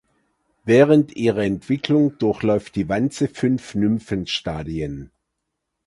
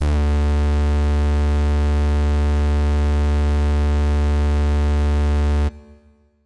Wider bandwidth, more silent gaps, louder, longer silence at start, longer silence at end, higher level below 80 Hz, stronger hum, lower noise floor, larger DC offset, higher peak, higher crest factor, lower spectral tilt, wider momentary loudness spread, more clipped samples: first, 11.5 kHz vs 8.6 kHz; neither; about the same, -20 LUFS vs -19 LUFS; first, 0.65 s vs 0 s; first, 0.8 s vs 0 s; second, -48 dBFS vs -20 dBFS; neither; first, -78 dBFS vs -53 dBFS; second, under 0.1% vs 1%; first, -2 dBFS vs -14 dBFS; first, 20 dB vs 4 dB; about the same, -6.5 dB/octave vs -7.5 dB/octave; first, 12 LU vs 0 LU; neither